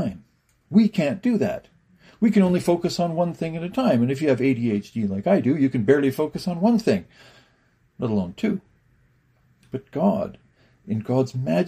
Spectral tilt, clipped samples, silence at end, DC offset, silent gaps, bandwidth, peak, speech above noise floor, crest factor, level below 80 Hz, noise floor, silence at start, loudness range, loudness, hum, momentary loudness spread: -7.5 dB/octave; under 0.1%; 0 s; under 0.1%; none; 15 kHz; -6 dBFS; 41 dB; 18 dB; -58 dBFS; -62 dBFS; 0 s; 7 LU; -22 LUFS; none; 11 LU